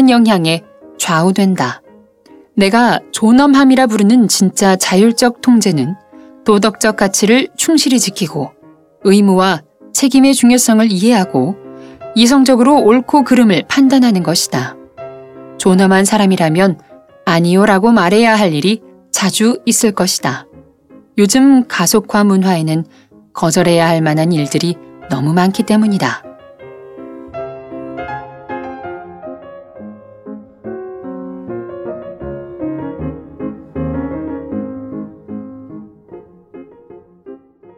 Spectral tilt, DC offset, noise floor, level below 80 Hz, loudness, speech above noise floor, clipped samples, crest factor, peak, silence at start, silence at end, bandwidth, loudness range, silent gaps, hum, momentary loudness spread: -4.5 dB/octave; under 0.1%; -44 dBFS; -48 dBFS; -12 LUFS; 33 dB; under 0.1%; 14 dB; 0 dBFS; 0 s; 0.45 s; 16 kHz; 17 LU; none; none; 20 LU